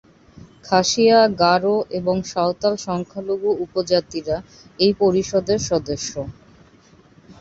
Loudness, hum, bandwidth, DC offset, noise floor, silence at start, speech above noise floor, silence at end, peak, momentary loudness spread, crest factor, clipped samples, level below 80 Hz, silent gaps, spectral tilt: -20 LUFS; none; 8 kHz; under 0.1%; -51 dBFS; 0.35 s; 32 dB; 0.1 s; -2 dBFS; 12 LU; 18 dB; under 0.1%; -50 dBFS; none; -4.5 dB/octave